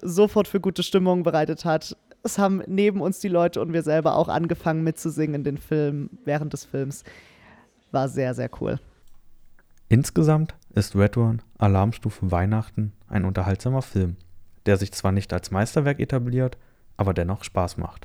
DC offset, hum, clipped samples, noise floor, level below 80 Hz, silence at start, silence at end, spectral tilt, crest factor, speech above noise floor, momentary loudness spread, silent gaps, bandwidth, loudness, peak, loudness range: under 0.1%; none; under 0.1%; -54 dBFS; -46 dBFS; 0 s; 0.05 s; -7 dB/octave; 20 dB; 31 dB; 9 LU; none; 17 kHz; -24 LUFS; -4 dBFS; 6 LU